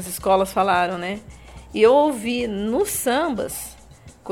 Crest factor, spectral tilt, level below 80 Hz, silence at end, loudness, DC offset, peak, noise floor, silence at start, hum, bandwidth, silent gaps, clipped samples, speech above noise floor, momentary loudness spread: 16 dB; -4 dB/octave; -48 dBFS; 0 s; -20 LUFS; under 0.1%; -4 dBFS; -46 dBFS; 0 s; none; 18 kHz; none; under 0.1%; 25 dB; 16 LU